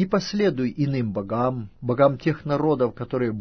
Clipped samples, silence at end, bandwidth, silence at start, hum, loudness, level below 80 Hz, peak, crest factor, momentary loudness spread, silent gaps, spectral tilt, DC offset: under 0.1%; 0 s; 6.6 kHz; 0 s; none; -24 LUFS; -52 dBFS; -4 dBFS; 18 dB; 6 LU; none; -7.5 dB/octave; under 0.1%